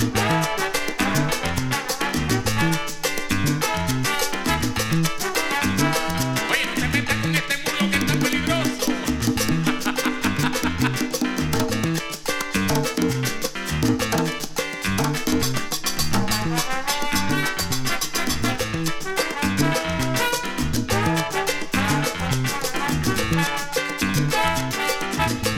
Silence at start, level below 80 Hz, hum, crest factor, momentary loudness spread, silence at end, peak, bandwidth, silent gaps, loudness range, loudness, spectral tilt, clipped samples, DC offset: 0 s; -38 dBFS; none; 18 dB; 3 LU; 0 s; -4 dBFS; 17.5 kHz; none; 2 LU; -22 LUFS; -4 dB/octave; under 0.1%; under 0.1%